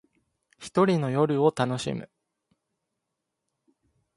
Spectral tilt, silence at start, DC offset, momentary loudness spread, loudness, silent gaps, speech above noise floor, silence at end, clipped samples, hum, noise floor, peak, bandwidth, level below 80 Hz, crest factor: -6.5 dB/octave; 0.6 s; under 0.1%; 12 LU; -25 LUFS; none; 59 dB; 2.1 s; under 0.1%; none; -83 dBFS; -8 dBFS; 11.5 kHz; -66 dBFS; 22 dB